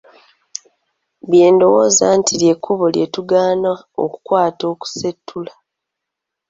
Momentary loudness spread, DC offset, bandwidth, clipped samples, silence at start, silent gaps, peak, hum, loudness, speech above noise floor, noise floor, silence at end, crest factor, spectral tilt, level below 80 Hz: 21 LU; under 0.1%; 8 kHz; under 0.1%; 1.25 s; none; -2 dBFS; none; -15 LUFS; 66 dB; -81 dBFS; 1.05 s; 14 dB; -4 dB/octave; -60 dBFS